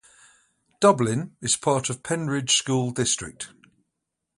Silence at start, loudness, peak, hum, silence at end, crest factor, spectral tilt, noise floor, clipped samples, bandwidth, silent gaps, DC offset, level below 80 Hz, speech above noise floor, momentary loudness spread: 0.8 s; -23 LUFS; -4 dBFS; none; 0.9 s; 22 dB; -3.5 dB/octave; -82 dBFS; under 0.1%; 11.5 kHz; none; under 0.1%; -60 dBFS; 58 dB; 9 LU